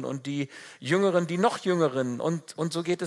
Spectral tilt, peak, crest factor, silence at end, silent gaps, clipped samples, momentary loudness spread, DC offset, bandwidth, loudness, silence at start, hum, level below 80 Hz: -6 dB/octave; -8 dBFS; 18 dB; 0 s; none; under 0.1%; 9 LU; under 0.1%; 12 kHz; -27 LUFS; 0 s; none; -78 dBFS